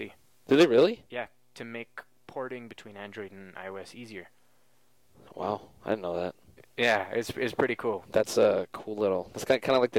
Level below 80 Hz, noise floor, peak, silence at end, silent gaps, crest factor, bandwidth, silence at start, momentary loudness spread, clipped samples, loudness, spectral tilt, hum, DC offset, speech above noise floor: -66 dBFS; -69 dBFS; -12 dBFS; 0 s; none; 18 dB; 16.5 kHz; 0 s; 20 LU; under 0.1%; -28 LUFS; -5 dB/octave; none; under 0.1%; 40 dB